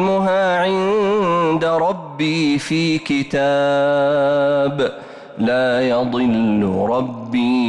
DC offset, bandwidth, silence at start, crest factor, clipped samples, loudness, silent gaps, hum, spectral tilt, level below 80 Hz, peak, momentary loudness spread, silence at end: under 0.1%; 11 kHz; 0 s; 8 dB; under 0.1%; -17 LUFS; none; none; -6 dB/octave; -54 dBFS; -10 dBFS; 6 LU; 0 s